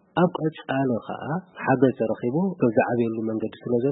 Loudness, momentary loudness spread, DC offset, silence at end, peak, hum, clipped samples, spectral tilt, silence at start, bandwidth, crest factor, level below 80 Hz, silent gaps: -25 LUFS; 9 LU; under 0.1%; 0 s; -4 dBFS; none; under 0.1%; -12 dB/octave; 0.15 s; 4 kHz; 20 dB; -64 dBFS; none